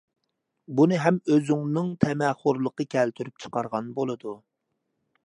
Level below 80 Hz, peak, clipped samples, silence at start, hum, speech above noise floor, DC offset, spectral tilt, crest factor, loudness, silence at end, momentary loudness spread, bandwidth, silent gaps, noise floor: -64 dBFS; -6 dBFS; under 0.1%; 0.7 s; none; 54 dB; under 0.1%; -7.5 dB/octave; 22 dB; -25 LUFS; 0.9 s; 11 LU; 10.5 kHz; none; -79 dBFS